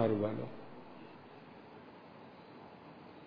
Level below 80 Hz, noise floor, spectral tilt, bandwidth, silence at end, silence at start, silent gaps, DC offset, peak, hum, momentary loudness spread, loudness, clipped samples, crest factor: -80 dBFS; -55 dBFS; -7 dB/octave; 5.2 kHz; 0 s; 0 s; none; under 0.1%; -18 dBFS; none; 18 LU; -44 LUFS; under 0.1%; 24 dB